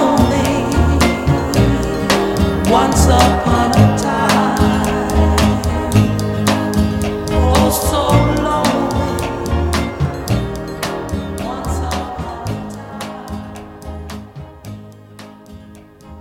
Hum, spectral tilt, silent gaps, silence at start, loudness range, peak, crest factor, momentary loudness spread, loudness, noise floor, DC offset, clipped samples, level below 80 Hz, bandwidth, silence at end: none; -5.5 dB/octave; none; 0 s; 14 LU; 0 dBFS; 16 dB; 16 LU; -15 LUFS; -39 dBFS; under 0.1%; under 0.1%; -24 dBFS; 17 kHz; 0 s